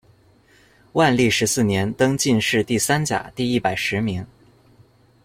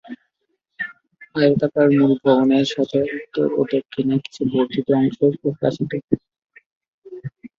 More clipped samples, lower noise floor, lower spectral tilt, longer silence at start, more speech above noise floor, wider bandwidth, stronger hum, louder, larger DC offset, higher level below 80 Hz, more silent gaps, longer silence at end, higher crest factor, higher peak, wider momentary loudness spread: neither; second, -55 dBFS vs -73 dBFS; second, -4 dB/octave vs -7.5 dB/octave; first, 0.95 s vs 0.05 s; second, 35 dB vs 55 dB; first, 16.5 kHz vs 7.4 kHz; neither; about the same, -20 LUFS vs -19 LUFS; neither; first, -52 dBFS vs -60 dBFS; second, none vs 6.04-6.08 s, 6.66-6.81 s, 6.88-7.02 s; first, 1 s vs 0.1 s; about the same, 18 dB vs 18 dB; about the same, -4 dBFS vs -2 dBFS; second, 8 LU vs 15 LU